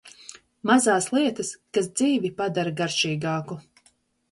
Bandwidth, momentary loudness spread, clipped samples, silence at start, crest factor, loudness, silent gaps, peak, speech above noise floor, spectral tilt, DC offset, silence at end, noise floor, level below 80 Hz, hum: 11.5 kHz; 19 LU; under 0.1%; 0.05 s; 18 dB; -24 LUFS; none; -6 dBFS; 40 dB; -4 dB/octave; under 0.1%; 0.7 s; -64 dBFS; -66 dBFS; none